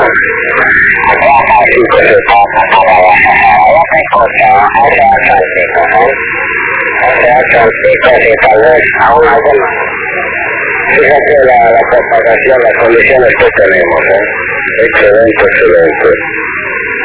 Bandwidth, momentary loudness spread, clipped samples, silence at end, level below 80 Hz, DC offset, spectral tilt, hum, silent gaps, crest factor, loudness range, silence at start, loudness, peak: 4 kHz; 6 LU; 4%; 0 s; -34 dBFS; under 0.1%; -8 dB/octave; none; none; 6 dB; 2 LU; 0 s; -6 LUFS; 0 dBFS